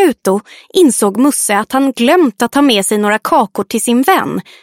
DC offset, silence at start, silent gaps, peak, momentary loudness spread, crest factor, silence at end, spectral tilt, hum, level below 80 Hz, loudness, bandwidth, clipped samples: under 0.1%; 0 s; none; 0 dBFS; 6 LU; 12 dB; 0.2 s; -3.5 dB/octave; none; -56 dBFS; -12 LUFS; 16.5 kHz; under 0.1%